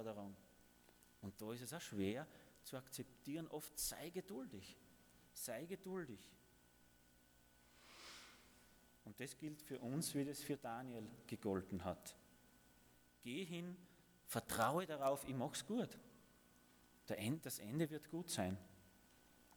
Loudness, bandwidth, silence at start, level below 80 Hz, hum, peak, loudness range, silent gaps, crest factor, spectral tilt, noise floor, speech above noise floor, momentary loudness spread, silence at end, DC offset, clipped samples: -47 LUFS; over 20 kHz; 0 s; -76 dBFS; 60 Hz at -75 dBFS; -24 dBFS; 10 LU; none; 26 dB; -4.5 dB/octave; -72 dBFS; 25 dB; 22 LU; 0 s; under 0.1%; under 0.1%